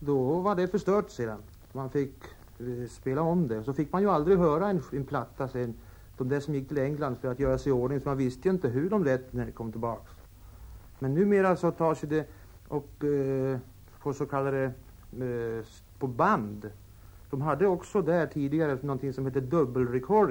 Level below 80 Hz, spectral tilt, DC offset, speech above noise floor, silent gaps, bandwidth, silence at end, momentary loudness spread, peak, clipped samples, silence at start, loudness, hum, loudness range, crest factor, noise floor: -52 dBFS; -8.5 dB/octave; under 0.1%; 21 dB; none; 19.5 kHz; 0 s; 12 LU; -10 dBFS; under 0.1%; 0 s; -29 LUFS; none; 4 LU; 18 dB; -49 dBFS